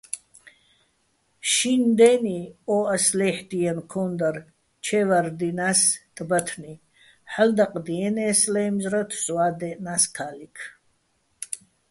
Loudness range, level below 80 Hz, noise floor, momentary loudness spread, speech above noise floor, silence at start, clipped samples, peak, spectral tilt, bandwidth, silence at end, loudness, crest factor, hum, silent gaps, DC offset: 3 LU; -66 dBFS; -69 dBFS; 17 LU; 46 dB; 0.15 s; under 0.1%; -4 dBFS; -3.5 dB/octave; 12 kHz; 0.35 s; -22 LUFS; 20 dB; none; none; under 0.1%